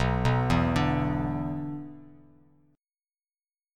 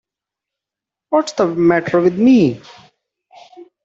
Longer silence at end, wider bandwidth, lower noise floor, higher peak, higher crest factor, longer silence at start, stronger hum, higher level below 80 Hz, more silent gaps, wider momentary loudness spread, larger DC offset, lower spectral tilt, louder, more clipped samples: first, 1.7 s vs 0.2 s; first, 11 kHz vs 7.8 kHz; first, under -90 dBFS vs -86 dBFS; second, -10 dBFS vs -2 dBFS; about the same, 18 dB vs 16 dB; second, 0 s vs 1.1 s; neither; first, -42 dBFS vs -58 dBFS; neither; first, 13 LU vs 7 LU; neither; about the same, -7.5 dB/octave vs -6.5 dB/octave; second, -27 LUFS vs -14 LUFS; neither